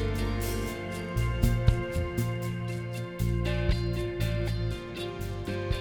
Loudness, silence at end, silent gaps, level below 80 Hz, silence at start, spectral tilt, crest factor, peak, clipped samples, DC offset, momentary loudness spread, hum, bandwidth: -31 LUFS; 0 s; none; -34 dBFS; 0 s; -6.5 dB/octave; 22 dB; -8 dBFS; under 0.1%; under 0.1%; 8 LU; none; over 20 kHz